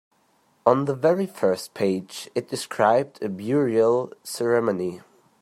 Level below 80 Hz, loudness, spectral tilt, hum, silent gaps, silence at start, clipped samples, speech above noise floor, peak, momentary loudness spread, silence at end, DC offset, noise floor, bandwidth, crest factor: -72 dBFS; -24 LUFS; -5.5 dB/octave; none; none; 0.65 s; under 0.1%; 41 dB; -2 dBFS; 10 LU; 0.4 s; under 0.1%; -64 dBFS; 15 kHz; 22 dB